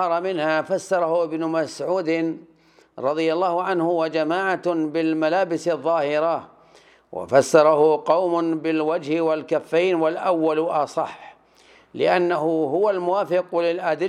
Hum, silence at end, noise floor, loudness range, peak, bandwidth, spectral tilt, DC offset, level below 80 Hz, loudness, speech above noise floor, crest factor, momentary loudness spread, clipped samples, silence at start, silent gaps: none; 0 s; -53 dBFS; 4 LU; -2 dBFS; 12 kHz; -5.5 dB/octave; under 0.1%; -74 dBFS; -21 LUFS; 33 dB; 20 dB; 6 LU; under 0.1%; 0 s; none